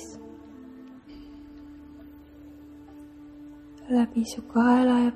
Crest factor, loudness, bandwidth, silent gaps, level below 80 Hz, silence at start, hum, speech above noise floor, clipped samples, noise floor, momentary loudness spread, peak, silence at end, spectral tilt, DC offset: 18 dB; -23 LUFS; 12 kHz; none; -56 dBFS; 0 s; none; 25 dB; under 0.1%; -47 dBFS; 27 LU; -10 dBFS; 0 s; -5.5 dB/octave; under 0.1%